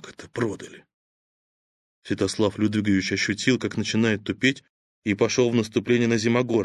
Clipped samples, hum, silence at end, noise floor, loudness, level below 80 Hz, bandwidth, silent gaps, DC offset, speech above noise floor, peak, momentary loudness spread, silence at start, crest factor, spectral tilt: under 0.1%; none; 0 s; under -90 dBFS; -23 LUFS; -54 dBFS; 11.5 kHz; 0.94-2.02 s, 4.69-5.02 s; under 0.1%; over 67 dB; -4 dBFS; 11 LU; 0.05 s; 20 dB; -5 dB/octave